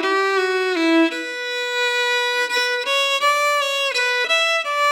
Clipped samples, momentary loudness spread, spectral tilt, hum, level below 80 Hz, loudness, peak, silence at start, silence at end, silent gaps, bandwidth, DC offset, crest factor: under 0.1%; 4 LU; 1 dB/octave; none; -88 dBFS; -18 LUFS; -6 dBFS; 0 s; 0 s; none; 19.5 kHz; under 0.1%; 14 dB